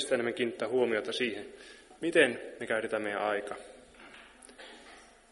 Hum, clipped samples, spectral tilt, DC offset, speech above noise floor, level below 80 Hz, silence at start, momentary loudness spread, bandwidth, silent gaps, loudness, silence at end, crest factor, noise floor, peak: none; under 0.1%; -3.5 dB/octave; under 0.1%; 24 dB; -70 dBFS; 0 s; 24 LU; 11.5 kHz; none; -31 LUFS; 0.25 s; 24 dB; -55 dBFS; -10 dBFS